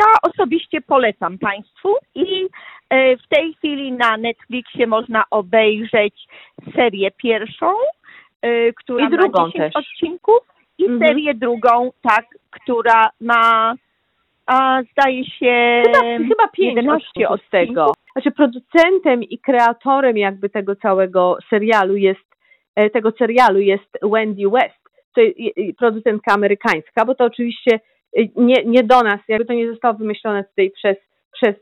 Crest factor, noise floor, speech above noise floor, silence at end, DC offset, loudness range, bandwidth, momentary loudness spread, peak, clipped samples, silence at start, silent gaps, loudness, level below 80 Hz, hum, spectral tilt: 14 dB; -66 dBFS; 51 dB; 0.05 s; under 0.1%; 3 LU; 9.6 kHz; 9 LU; -2 dBFS; under 0.1%; 0 s; 8.36-8.40 s, 22.25-22.29 s, 22.68-22.74 s, 25.04-25.12 s, 31.25-31.31 s; -16 LUFS; -62 dBFS; none; -6 dB/octave